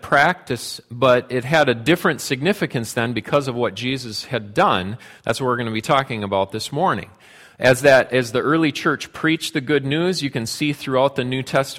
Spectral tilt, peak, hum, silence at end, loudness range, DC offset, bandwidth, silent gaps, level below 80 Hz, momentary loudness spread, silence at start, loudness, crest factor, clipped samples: -5 dB/octave; -2 dBFS; none; 0 s; 3 LU; under 0.1%; 16.5 kHz; none; -54 dBFS; 8 LU; 0.05 s; -20 LUFS; 18 dB; under 0.1%